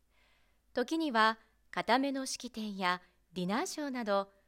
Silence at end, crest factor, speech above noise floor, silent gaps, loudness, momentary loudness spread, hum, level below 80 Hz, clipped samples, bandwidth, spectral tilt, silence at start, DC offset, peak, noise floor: 0.2 s; 20 dB; 36 dB; none; -34 LUFS; 12 LU; none; -72 dBFS; under 0.1%; 16 kHz; -3.5 dB/octave; 0.75 s; under 0.1%; -14 dBFS; -69 dBFS